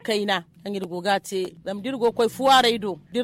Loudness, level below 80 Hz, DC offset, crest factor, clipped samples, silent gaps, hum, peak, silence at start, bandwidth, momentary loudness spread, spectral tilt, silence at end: -23 LUFS; -60 dBFS; under 0.1%; 16 dB; under 0.1%; none; none; -8 dBFS; 0.05 s; 16.5 kHz; 14 LU; -3.5 dB/octave; 0 s